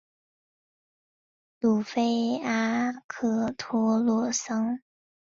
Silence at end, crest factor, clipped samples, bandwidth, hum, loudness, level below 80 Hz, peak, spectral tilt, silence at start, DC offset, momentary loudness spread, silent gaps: 0.45 s; 16 dB; under 0.1%; 7.6 kHz; none; -27 LUFS; -68 dBFS; -12 dBFS; -4.5 dB/octave; 1.6 s; under 0.1%; 6 LU; 3.04-3.09 s